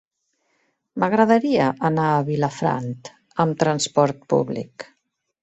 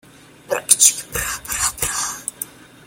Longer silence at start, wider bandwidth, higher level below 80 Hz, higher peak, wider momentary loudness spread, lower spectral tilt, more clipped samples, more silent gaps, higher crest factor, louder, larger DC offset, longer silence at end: first, 0.95 s vs 0.5 s; second, 8.2 kHz vs 17 kHz; second, -62 dBFS vs -44 dBFS; second, -4 dBFS vs 0 dBFS; about the same, 18 LU vs 17 LU; first, -6 dB/octave vs 0.5 dB/octave; neither; neither; about the same, 18 dB vs 22 dB; second, -21 LUFS vs -17 LUFS; neither; first, 0.6 s vs 0.35 s